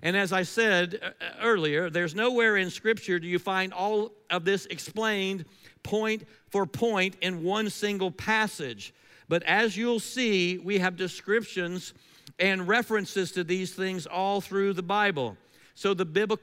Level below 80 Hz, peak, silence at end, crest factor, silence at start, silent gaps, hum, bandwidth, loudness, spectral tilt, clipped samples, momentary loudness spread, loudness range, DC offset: -70 dBFS; -10 dBFS; 0.05 s; 18 dB; 0 s; none; none; 16 kHz; -27 LUFS; -4.5 dB/octave; under 0.1%; 10 LU; 3 LU; under 0.1%